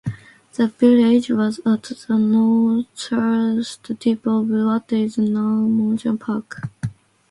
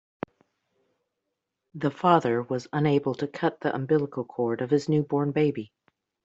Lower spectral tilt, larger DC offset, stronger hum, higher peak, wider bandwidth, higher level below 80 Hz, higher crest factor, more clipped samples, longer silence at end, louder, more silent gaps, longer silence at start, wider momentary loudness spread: about the same, -7 dB/octave vs -6.5 dB/octave; neither; neither; about the same, -4 dBFS vs -6 dBFS; first, 11.5 kHz vs 7.8 kHz; first, -58 dBFS vs -68 dBFS; second, 16 dB vs 22 dB; neither; second, 0.4 s vs 0.6 s; first, -19 LUFS vs -26 LUFS; neither; second, 0.05 s vs 1.75 s; second, 13 LU vs 17 LU